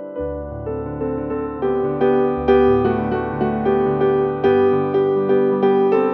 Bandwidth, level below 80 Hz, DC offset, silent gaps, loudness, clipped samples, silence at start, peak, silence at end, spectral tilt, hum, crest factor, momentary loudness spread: 4.3 kHz; -40 dBFS; under 0.1%; none; -18 LUFS; under 0.1%; 0 s; -2 dBFS; 0 s; -10 dB/octave; none; 14 dB; 11 LU